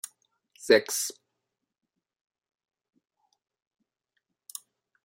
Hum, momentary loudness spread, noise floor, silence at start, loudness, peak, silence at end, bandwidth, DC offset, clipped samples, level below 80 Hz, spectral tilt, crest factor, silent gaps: none; 21 LU; -84 dBFS; 0.6 s; -25 LUFS; -6 dBFS; 3.95 s; 16 kHz; under 0.1%; under 0.1%; -84 dBFS; -1.5 dB/octave; 28 dB; none